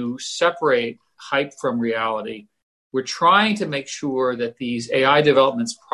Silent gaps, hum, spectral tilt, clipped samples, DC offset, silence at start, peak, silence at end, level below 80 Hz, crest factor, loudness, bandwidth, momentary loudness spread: 2.63-2.90 s; none; -4 dB/octave; under 0.1%; under 0.1%; 0 s; -4 dBFS; 0.2 s; -64 dBFS; 16 dB; -20 LUFS; 11.5 kHz; 13 LU